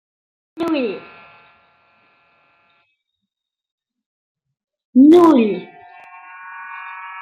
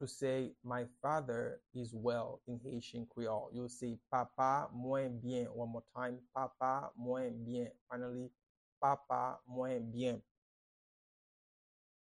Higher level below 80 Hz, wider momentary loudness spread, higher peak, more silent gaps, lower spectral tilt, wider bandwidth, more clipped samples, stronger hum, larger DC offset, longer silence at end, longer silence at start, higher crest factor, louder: first, -66 dBFS vs -74 dBFS; first, 25 LU vs 9 LU; first, -2 dBFS vs -20 dBFS; about the same, 3.72-3.78 s, 4.06-4.35 s, 4.85-4.93 s vs 7.81-7.87 s, 8.49-8.81 s; about the same, -7 dB/octave vs -6.5 dB/octave; about the same, 9.6 kHz vs 10.5 kHz; neither; neither; neither; second, 0 s vs 1.8 s; first, 0.55 s vs 0 s; about the same, 18 dB vs 20 dB; first, -14 LUFS vs -41 LUFS